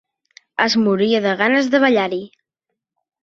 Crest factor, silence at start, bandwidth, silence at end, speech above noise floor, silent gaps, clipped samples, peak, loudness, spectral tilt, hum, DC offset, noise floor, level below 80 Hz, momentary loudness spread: 18 dB; 0.6 s; 7.6 kHz; 0.95 s; 63 dB; none; under 0.1%; -2 dBFS; -16 LUFS; -5 dB/octave; none; under 0.1%; -80 dBFS; -64 dBFS; 9 LU